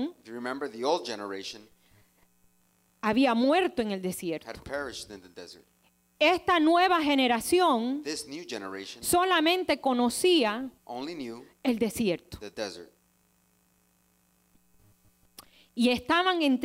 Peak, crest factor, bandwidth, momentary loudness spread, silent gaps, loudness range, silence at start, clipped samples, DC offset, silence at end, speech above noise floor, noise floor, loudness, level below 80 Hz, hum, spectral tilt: -12 dBFS; 18 dB; 16 kHz; 16 LU; none; 10 LU; 0 s; under 0.1%; under 0.1%; 0 s; 41 dB; -68 dBFS; -27 LUFS; -62 dBFS; none; -3.5 dB/octave